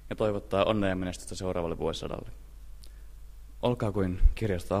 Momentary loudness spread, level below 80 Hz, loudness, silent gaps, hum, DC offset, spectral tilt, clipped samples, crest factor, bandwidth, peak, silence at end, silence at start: 24 LU; -34 dBFS; -31 LUFS; none; none; under 0.1%; -6.5 dB/octave; under 0.1%; 22 dB; 14 kHz; -8 dBFS; 0 s; 0 s